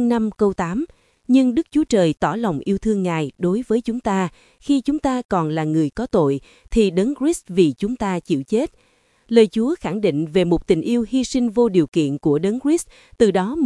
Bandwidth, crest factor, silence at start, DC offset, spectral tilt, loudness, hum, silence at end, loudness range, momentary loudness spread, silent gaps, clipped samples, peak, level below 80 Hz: 12 kHz; 18 dB; 0 s; under 0.1%; -6.5 dB/octave; -20 LUFS; none; 0 s; 2 LU; 6 LU; 5.25-5.29 s, 11.88-11.92 s; under 0.1%; 0 dBFS; -42 dBFS